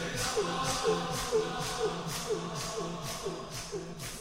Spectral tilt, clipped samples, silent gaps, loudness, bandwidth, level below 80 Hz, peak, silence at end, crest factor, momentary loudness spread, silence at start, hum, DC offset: -3.5 dB/octave; under 0.1%; none; -34 LUFS; 16 kHz; -52 dBFS; -18 dBFS; 0 s; 16 dB; 8 LU; 0 s; none; under 0.1%